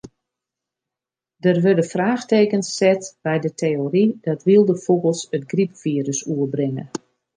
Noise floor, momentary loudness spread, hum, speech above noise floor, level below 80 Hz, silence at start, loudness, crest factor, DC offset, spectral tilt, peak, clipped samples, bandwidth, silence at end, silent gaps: -88 dBFS; 8 LU; none; 69 dB; -68 dBFS; 0.05 s; -20 LUFS; 16 dB; under 0.1%; -6 dB/octave; -4 dBFS; under 0.1%; 10 kHz; 0.4 s; none